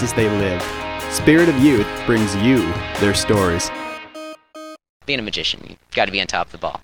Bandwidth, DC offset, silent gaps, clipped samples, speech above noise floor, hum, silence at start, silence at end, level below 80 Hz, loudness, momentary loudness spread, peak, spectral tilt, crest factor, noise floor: 18.5 kHz; under 0.1%; 4.89-5.00 s; under 0.1%; 20 dB; none; 0 s; 0.05 s; -40 dBFS; -18 LUFS; 20 LU; 0 dBFS; -4.5 dB/octave; 18 dB; -38 dBFS